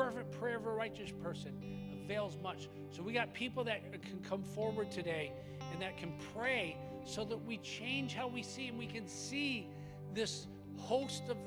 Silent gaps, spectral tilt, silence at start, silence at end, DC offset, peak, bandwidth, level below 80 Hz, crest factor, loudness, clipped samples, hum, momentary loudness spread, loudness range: none; -4.5 dB/octave; 0 s; 0 s; under 0.1%; -22 dBFS; over 20 kHz; -68 dBFS; 20 dB; -42 LUFS; under 0.1%; none; 9 LU; 1 LU